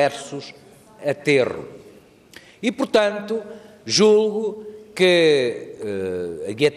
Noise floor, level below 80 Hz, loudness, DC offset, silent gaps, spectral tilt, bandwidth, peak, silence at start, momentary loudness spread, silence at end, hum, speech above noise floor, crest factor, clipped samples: -48 dBFS; -64 dBFS; -20 LUFS; under 0.1%; none; -4 dB/octave; 13 kHz; -4 dBFS; 0 s; 20 LU; 0 s; none; 28 dB; 16 dB; under 0.1%